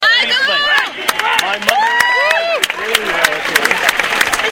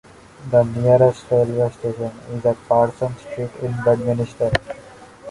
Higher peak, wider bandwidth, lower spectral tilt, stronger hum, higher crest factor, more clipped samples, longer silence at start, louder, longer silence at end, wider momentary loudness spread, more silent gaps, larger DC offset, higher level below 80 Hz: about the same, 0 dBFS vs -2 dBFS; first, over 20 kHz vs 11.5 kHz; second, 0 dB/octave vs -7.5 dB/octave; neither; about the same, 14 dB vs 18 dB; first, 0.1% vs under 0.1%; second, 0 s vs 0.4 s; first, -12 LUFS vs -20 LUFS; about the same, 0 s vs 0 s; second, 4 LU vs 13 LU; neither; neither; about the same, -48 dBFS vs -46 dBFS